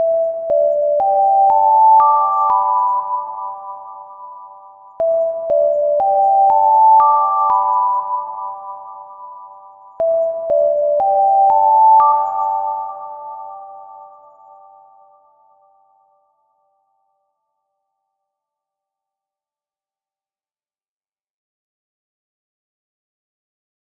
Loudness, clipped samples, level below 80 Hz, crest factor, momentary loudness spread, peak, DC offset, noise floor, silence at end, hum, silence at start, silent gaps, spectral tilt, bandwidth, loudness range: -14 LUFS; under 0.1%; -64 dBFS; 14 dB; 23 LU; -2 dBFS; under 0.1%; under -90 dBFS; 9.9 s; none; 0 s; none; -7 dB/octave; 2.6 kHz; 7 LU